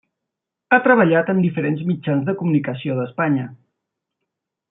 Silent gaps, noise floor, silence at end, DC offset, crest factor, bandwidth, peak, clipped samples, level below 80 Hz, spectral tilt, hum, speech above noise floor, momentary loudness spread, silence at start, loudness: none; -82 dBFS; 1.15 s; under 0.1%; 18 dB; 3.9 kHz; -2 dBFS; under 0.1%; -66 dBFS; -12 dB/octave; none; 64 dB; 10 LU; 0.7 s; -19 LUFS